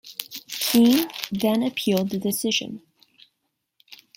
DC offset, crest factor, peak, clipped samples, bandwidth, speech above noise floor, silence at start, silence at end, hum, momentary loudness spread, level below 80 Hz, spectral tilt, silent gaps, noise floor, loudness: under 0.1%; 24 dB; 0 dBFS; under 0.1%; 16.5 kHz; 56 dB; 0.05 s; 0.2 s; none; 16 LU; -66 dBFS; -4 dB/octave; none; -77 dBFS; -22 LUFS